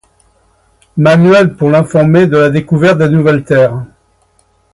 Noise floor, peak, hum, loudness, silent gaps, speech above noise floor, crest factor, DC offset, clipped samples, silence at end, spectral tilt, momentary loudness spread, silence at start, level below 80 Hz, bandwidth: -53 dBFS; 0 dBFS; none; -9 LUFS; none; 45 dB; 10 dB; under 0.1%; under 0.1%; 0.85 s; -8 dB/octave; 5 LU; 0.95 s; -44 dBFS; 11 kHz